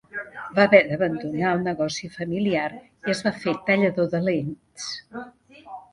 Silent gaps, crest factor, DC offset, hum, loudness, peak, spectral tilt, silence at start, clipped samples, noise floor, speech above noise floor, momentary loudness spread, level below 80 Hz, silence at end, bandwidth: none; 24 dB; under 0.1%; none; -23 LUFS; 0 dBFS; -5.5 dB/octave; 0.15 s; under 0.1%; -43 dBFS; 20 dB; 18 LU; -60 dBFS; 0.15 s; 11.5 kHz